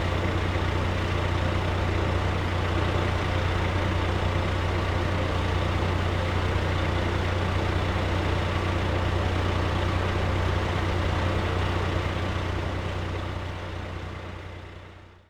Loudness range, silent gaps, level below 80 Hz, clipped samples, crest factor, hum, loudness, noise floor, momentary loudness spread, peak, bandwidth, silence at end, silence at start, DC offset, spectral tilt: 2 LU; none; -34 dBFS; under 0.1%; 14 dB; none; -27 LUFS; -46 dBFS; 8 LU; -12 dBFS; 10 kHz; 0.25 s; 0 s; under 0.1%; -6.5 dB/octave